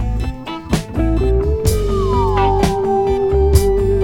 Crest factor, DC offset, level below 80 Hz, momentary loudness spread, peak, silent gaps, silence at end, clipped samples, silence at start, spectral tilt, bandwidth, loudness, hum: 14 dB; under 0.1%; -20 dBFS; 8 LU; 0 dBFS; none; 0 s; under 0.1%; 0 s; -6.5 dB/octave; 18.5 kHz; -16 LUFS; none